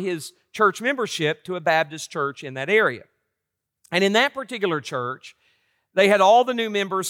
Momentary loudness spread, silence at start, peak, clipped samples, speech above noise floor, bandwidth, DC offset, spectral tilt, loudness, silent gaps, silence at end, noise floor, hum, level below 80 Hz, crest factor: 13 LU; 0 s; -6 dBFS; under 0.1%; 61 dB; 16.5 kHz; under 0.1%; -4 dB/octave; -21 LUFS; none; 0 s; -82 dBFS; none; -76 dBFS; 18 dB